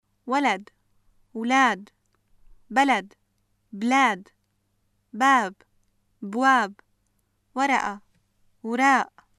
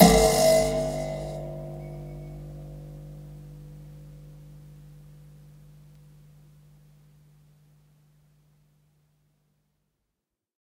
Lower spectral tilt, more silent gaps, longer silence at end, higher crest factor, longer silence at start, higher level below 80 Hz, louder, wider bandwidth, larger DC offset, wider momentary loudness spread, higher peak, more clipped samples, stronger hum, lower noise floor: second, -3 dB/octave vs -4.5 dB/octave; neither; second, 0.35 s vs 6.3 s; second, 18 dB vs 28 dB; first, 0.25 s vs 0 s; second, -66 dBFS vs -44 dBFS; about the same, -23 LUFS vs -24 LUFS; second, 13 kHz vs 16 kHz; neither; second, 17 LU vs 29 LU; second, -6 dBFS vs -2 dBFS; neither; neither; second, -71 dBFS vs -84 dBFS